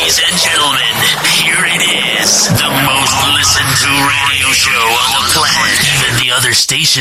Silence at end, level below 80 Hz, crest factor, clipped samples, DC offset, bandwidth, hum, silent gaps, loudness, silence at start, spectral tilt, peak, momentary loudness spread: 0 s; -38 dBFS; 10 dB; under 0.1%; under 0.1%; 16.5 kHz; none; none; -9 LUFS; 0 s; -1 dB/octave; 0 dBFS; 2 LU